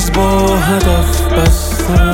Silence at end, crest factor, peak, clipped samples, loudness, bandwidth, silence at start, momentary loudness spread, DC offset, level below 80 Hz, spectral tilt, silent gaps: 0 s; 10 dB; 0 dBFS; under 0.1%; -12 LUFS; 17 kHz; 0 s; 2 LU; under 0.1%; -14 dBFS; -5.5 dB/octave; none